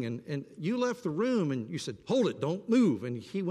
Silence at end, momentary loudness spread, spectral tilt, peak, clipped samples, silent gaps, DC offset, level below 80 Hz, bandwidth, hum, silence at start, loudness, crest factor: 0 s; 11 LU; -6.5 dB/octave; -16 dBFS; under 0.1%; none; under 0.1%; -74 dBFS; 11.5 kHz; none; 0 s; -31 LUFS; 14 dB